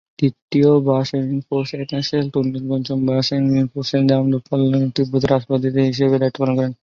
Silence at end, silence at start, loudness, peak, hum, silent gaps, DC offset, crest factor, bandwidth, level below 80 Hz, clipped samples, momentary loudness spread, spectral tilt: 0.1 s; 0.2 s; -18 LUFS; -2 dBFS; none; 0.42-0.49 s; under 0.1%; 16 dB; 7.2 kHz; -52 dBFS; under 0.1%; 6 LU; -7.5 dB/octave